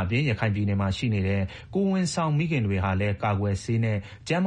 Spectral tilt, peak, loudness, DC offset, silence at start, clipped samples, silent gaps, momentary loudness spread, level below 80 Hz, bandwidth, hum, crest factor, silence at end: -6.5 dB/octave; -12 dBFS; -26 LUFS; under 0.1%; 0 s; under 0.1%; none; 4 LU; -50 dBFS; 9.8 kHz; none; 14 dB; 0 s